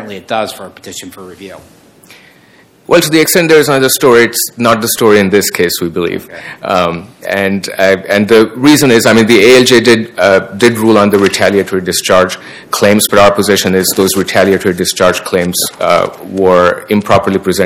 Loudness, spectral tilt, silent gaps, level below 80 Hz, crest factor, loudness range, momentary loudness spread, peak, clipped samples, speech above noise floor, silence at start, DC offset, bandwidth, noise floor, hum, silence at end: -9 LUFS; -4 dB/octave; none; -44 dBFS; 10 dB; 5 LU; 11 LU; 0 dBFS; 4%; 34 dB; 0 s; under 0.1%; over 20 kHz; -44 dBFS; none; 0 s